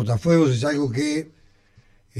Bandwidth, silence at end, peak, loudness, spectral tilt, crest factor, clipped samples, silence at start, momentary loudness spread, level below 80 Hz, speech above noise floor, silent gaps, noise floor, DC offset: 12.5 kHz; 0 s; -6 dBFS; -21 LUFS; -6.5 dB/octave; 16 dB; under 0.1%; 0 s; 10 LU; -54 dBFS; 35 dB; none; -56 dBFS; under 0.1%